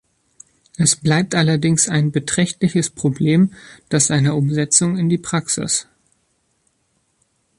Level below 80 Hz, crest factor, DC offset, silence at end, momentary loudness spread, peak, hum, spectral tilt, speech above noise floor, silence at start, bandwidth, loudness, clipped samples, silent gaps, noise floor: -54 dBFS; 18 dB; under 0.1%; 1.75 s; 6 LU; 0 dBFS; none; -4.5 dB/octave; 49 dB; 0.8 s; 11.5 kHz; -17 LUFS; under 0.1%; none; -66 dBFS